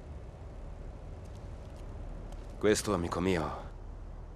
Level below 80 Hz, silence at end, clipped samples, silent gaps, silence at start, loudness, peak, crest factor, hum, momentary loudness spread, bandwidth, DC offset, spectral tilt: -46 dBFS; 0 s; under 0.1%; none; 0 s; -33 LUFS; -12 dBFS; 24 dB; none; 18 LU; 15 kHz; under 0.1%; -5 dB/octave